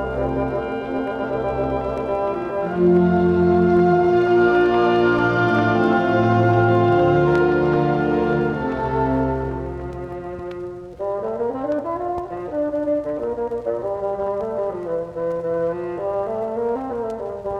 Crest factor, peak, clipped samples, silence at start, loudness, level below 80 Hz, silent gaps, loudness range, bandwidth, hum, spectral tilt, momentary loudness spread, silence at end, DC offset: 14 dB; -6 dBFS; under 0.1%; 0 s; -20 LUFS; -42 dBFS; none; 8 LU; 6.4 kHz; none; -9 dB/octave; 11 LU; 0 s; under 0.1%